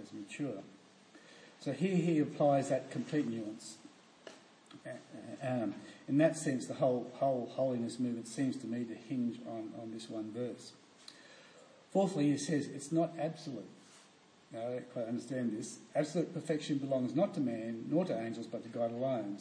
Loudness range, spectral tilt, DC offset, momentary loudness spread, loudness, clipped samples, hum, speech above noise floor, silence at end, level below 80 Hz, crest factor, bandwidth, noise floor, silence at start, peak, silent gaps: 6 LU; -6.5 dB/octave; under 0.1%; 21 LU; -36 LUFS; under 0.1%; none; 28 dB; 0 s; -86 dBFS; 20 dB; 10.5 kHz; -63 dBFS; 0 s; -18 dBFS; none